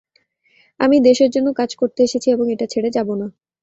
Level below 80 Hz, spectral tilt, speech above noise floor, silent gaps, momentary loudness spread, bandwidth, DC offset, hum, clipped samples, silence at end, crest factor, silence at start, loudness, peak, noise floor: -60 dBFS; -5 dB/octave; 45 dB; none; 9 LU; 8 kHz; under 0.1%; none; under 0.1%; 0.3 s; 16 dB; 0.8 s; -17 LUFS; -2 dBFS; -61 dBFS